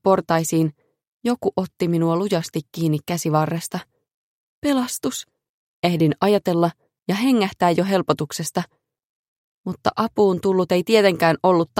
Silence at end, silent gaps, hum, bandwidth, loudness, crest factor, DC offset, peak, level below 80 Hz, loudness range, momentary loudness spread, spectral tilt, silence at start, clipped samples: 0 s; 1.07-1.20 s, 4.14-4.62 s, 5.49-5.83 s, 7.02-7.06 s, 9.04-9.64 s; none; 16.5 kHz; -21 LUFS; 18 dB; under 0.1%; -2 dBFS; -60 dBFS; 3 LU; 10 LU; -5.5 dB/octave; 0.05 s; under 0.1%